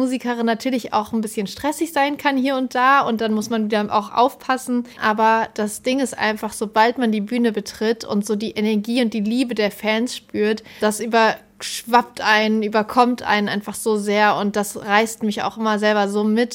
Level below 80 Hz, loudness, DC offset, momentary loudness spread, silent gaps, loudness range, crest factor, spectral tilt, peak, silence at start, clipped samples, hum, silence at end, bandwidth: -60 dBFS; -20 LUFS; under 0.1%; 7 LU; none; 2 LU; 18 dB; -4 dB/octave; -2 dBFS; 0 s; under 0.1%; none; 0 s; 17 kHz